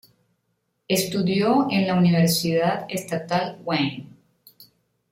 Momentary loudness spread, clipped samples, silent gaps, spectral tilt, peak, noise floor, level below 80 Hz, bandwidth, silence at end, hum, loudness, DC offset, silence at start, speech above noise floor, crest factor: 9 LU; under 0.1%; none; -5.5 dB/octave; -8 dBFS; -73 dBFS; -62 dBFS; 16.5 kHz; 0.5 s; none; -22 LUFS; under 0.1%; 0.9 s; 52 dB; 16 dB